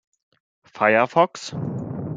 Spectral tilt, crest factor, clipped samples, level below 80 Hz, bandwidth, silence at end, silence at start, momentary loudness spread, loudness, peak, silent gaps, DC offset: -5.5 dB/octave; 20 dB; under 0.1%; -62 dBFS; 9.2 kHz; 0 s; 0.75 s; 13 LU; -21 LUFS; -2 dBFS; none; under 0.1%